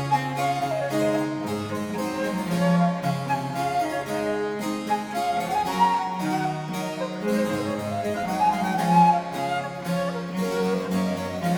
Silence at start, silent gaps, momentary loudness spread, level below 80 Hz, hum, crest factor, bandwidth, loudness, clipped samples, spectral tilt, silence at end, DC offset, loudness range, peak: 0 s; none; 7 LU; -60 dBFS; none; 18 dB; 19.5 kHz; -25 LUFS; under 0.1%; -6 dB/octave; 0 s; under 0.1%; 2 LU; -6 dBFS